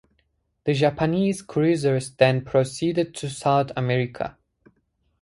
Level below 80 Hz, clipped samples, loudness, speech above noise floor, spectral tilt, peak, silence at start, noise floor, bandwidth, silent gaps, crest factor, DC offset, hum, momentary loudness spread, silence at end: -56 dBFS; under 0.1%; -23 LUFS; 48 dB; -6.5 dB/octave; -2 dBFS; 0.65 s; -70 dBFS; 11.5 kHz; none; 20 dB; under 0.1%; none; 8 LU; 0.9 s